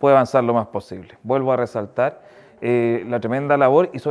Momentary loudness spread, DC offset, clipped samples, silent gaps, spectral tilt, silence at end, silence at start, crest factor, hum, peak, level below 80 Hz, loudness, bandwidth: 14 LU; under 0.1%; under 0.1%; none; -8 dB/octave; 0 s; 0 s; 18 dB; none; -2 dBFS; -64 dBFS; -19 LUFS; 11 kHz